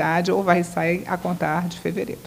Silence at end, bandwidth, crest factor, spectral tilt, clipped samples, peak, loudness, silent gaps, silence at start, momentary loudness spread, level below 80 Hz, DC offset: 0 s; 16 kHz; 20 dB; -6 dB/octave; under 0.1%; -2 dBFS; -22 LUFS; none; 0 s; 8 LU; -56 dBFS; under 0.1%